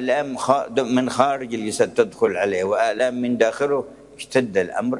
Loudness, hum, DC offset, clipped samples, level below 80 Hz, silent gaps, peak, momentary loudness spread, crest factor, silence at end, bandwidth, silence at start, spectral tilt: -21 LUFS; none; under 0.1%; under 0.1%; -62 dBFS; none; 0 dBFS; 5 LU; 20 dB; 0 s; 11.5 kHz; 0 s; -4.5 dB/octave